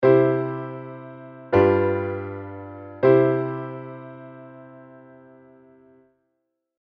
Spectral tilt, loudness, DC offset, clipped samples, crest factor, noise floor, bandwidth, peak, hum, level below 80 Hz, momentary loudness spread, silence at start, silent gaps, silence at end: -10.5 dB/octave; -21 LUFS; under 0.1%; under 0.1%; 20 dB; -77 dBFS; 5.2 kHz; -4 dBFS; none; -60 dBFS; 24 LU; 0 s; none; 2 s